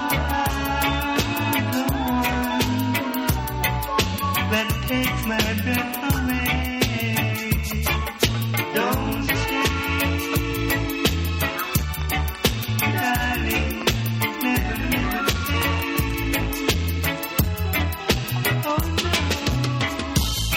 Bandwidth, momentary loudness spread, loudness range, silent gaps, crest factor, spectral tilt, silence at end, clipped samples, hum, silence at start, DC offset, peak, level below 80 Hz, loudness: 17.5 kHz; 2 LU; 1 LU; none; 18 dB; -4.5 dB/octave; 0 s; under 0.1%; none; 0 s; under 0.1%; -4 dBFS; -32 dBFS; -22 LUFS